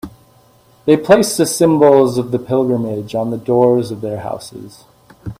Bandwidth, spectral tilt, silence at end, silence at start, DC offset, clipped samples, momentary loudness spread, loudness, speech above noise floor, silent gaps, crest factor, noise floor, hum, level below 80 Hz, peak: 16 kHz; -5.5 dB/octave; 0.05 s; 0.05 s; under 0.1%; under 0.1%; 21 LU; -14 LUFS; 36 dB; none; 16 dB; -49 dBFS; none; -50 dBFS; 0 dBFS